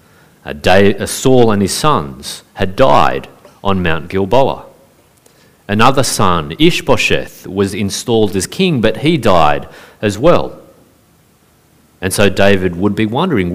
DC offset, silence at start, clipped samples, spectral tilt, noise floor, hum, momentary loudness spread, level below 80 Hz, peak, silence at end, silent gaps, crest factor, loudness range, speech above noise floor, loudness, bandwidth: 4%; 0 s; 0.1%; -5 dB/octave; -50 dBFS; none; 11 LU; -36 dBFS; 0 dBFS; 0 s; none; 14 dB; 3 LU; 38 dB; -13 LUFS; 16.5 kHz